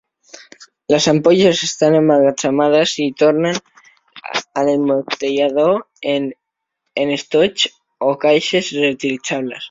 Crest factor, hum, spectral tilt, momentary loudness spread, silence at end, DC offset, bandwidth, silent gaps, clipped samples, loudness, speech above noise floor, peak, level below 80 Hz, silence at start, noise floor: 16 dB; none; -4.5 dB/octave; 9 LU; 0 s; under 0.1%; 7.8 kHz; none; under 0.1%; -16 LUFS; 60 dB; 0 dBFS; -60 dBFS; 0.6 s; -75 dBFS